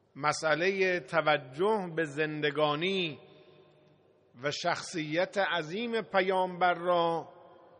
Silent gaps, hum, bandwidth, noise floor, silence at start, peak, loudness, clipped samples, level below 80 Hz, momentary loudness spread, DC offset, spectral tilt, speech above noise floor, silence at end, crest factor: none; none; 10 kHz; -64 dBFS; 0.15 s; -10 dBFS; -30 LUFS; under 0.1%; -78 dBFS; 6 LU; under 0.1%; -4.5 dB/octave; 34 dB; 0.3 s; 20 dB